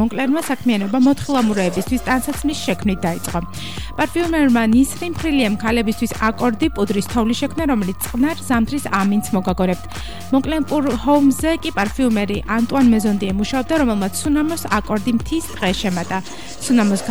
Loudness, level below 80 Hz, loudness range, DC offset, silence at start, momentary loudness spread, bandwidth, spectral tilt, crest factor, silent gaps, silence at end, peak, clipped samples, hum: -18 LUFS; -36 dBFS; 2 LU; 2%; 0 s; 7 LU; over 20 kHz; -5 dB/octave; 14 dB; none; 0 s; -6 dBFS; under 0.1%; none